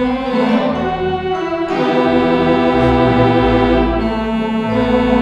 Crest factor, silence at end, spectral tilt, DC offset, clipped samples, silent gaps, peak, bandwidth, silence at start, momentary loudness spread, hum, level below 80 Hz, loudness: 14 dB; 0 s; -7.5 dB/octave; under 0.1%; under 0.1%; none; 0 dBFS; 8.4 kHz; 0 s; 6 LU; none; -28 dBFS; -14 LUFS